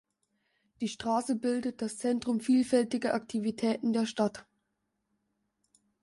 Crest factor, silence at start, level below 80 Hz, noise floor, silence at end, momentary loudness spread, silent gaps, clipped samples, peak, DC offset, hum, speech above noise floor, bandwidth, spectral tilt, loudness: 18 dB; 0.8 s; -72 dBFS; -81 dBFS; 1.6 s; 8 LU; none; under 0.1%; -14 dBFS; under 0.1%; none; 51 dB; 11.5 kHz; -5 dB/octave; -31 LUFS